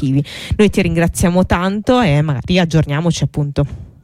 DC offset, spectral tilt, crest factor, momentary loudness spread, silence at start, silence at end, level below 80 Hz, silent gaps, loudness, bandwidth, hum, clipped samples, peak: under 0.1%; -6 dB/octave; 12 dB; 6 LU; 0 s; 0.15 s; -30 dBFS; none; -15 LUFS; 15 kHz; none; under 0.1%; -2 dBFS